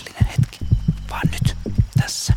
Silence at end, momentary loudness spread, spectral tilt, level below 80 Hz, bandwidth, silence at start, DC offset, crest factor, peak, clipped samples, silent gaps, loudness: 0 s; 3 LU; -5 dB/octave; -28 dBFS; 16 kHz; 0 s; under 0.1%; 16 dB; -4 dBFS; under 0.1%; none; -21 LUFS